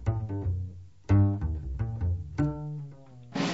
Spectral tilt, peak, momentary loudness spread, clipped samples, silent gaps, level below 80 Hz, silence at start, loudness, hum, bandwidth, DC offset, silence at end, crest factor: -7.5 dB/octave; -12 dBFS; 17 LU; under 0.1%; none; -40 dBFS; 0 s; -30 LUFS; none; 8 kHz; 0.2%; 0 s; 18 dB